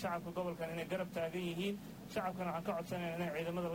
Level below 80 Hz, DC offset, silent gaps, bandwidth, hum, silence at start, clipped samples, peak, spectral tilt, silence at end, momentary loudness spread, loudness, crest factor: -66 dBFS; under 0.1%; none; 16 kHz; none; 0 s; under 0.1%; -26 dBFS; -6 dB/octave; 0 s; 2 LU; -41 LUFS; 14 dB